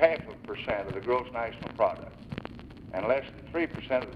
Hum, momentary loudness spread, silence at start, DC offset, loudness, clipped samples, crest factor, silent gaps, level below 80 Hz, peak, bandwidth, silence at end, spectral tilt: none; 12 LU; 0 s; under 0.1%; -32 LUFS; under 0.1%; 22 dB; none; -54 dBFS; -8 dBFS; 5.6 kHz; 0 s; -7.5 dB/octave